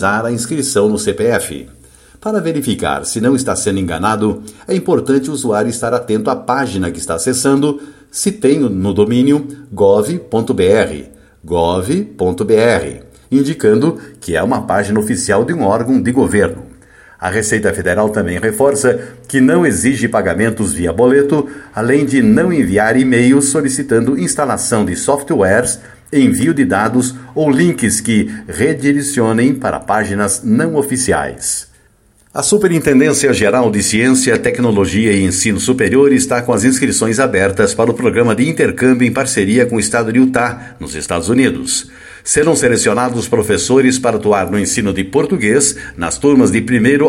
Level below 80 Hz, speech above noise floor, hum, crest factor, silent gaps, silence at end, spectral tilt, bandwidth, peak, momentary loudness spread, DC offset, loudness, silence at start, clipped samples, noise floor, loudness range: -42 dBFS; 38 dB; none; 12 dB; none; 0 s; -4.5 dB/octave; 16.5 kHz; 0 dBFS; 7 LU; under 0.1%; -13 LUFS; 0 s; under 0.1%; -51 dBFS; 4 LU